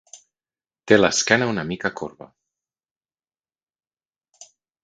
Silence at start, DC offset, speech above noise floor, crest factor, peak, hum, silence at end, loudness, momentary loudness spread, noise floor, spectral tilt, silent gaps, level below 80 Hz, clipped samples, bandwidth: 0.15 s; under 0.1%; over 70 dB; 26 dB; 0 dBFS; none; 0.4 s; -19 LUFS; 16 LU; under -90 dBFS; -3.5 dB/octave; 2.91-2.96 s, 3.63-3.67 s; -58 dBFS; under 0.1%; 9.4 kHz